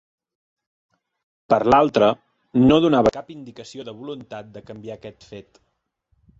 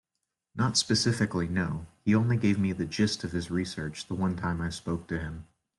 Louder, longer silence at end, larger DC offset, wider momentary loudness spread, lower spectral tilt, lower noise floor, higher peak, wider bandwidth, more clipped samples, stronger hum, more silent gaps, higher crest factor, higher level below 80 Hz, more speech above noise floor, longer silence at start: first, -17 LUFS vs -29 LUFS; first, 1 s vs 0.35 s; neither; first, 23 LU vs 10 LU; first, -7 dB/octave vs -5 dB/octave; second, -69 dBFS vs -85 dBFS; first, -4 dBFS vs -12 dBFS; second, 7.8 kHz vs 12 kHz; neither; neither; neither; about the same, 20 dB vs 18 dB; about the same, -50 dBFS vs -54 dBFS; second, 49 dB vs 56 dB; first, 1.5 s vs 0.55 s